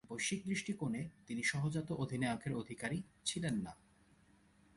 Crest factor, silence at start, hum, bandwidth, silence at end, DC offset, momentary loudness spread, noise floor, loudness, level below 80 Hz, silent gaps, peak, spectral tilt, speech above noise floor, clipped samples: 18 dB; 0.1 s; none; 11.5 kHz; 1.05 s; under 0.1%; 5 LU; -69 dBFS; -40 LUFS; -68 dBFS; none; -22 dBFS; -4.5 dB/octave; 29 dB; under 0.1%